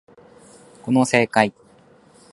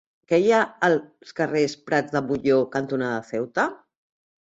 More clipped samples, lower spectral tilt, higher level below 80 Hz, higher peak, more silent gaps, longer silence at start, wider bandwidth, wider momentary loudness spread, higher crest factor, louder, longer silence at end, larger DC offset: neither; about the same, -5 dB/octave vs -5.5 dB/octave; about the same, -62 dBFS vs -64 dBFS; first, 0 dBFS vs -6 dBFS; neither; first, 0.85 s vs 0.3 s; first, 11.5 kHz vs 8 kHz; about the same, 7 LU vs 8 LU; about the same, 22 dB vs 18 dB; first, -19 LUFS vs -23 LUFS; about the same, 0.8 s vs 0.75 s; neither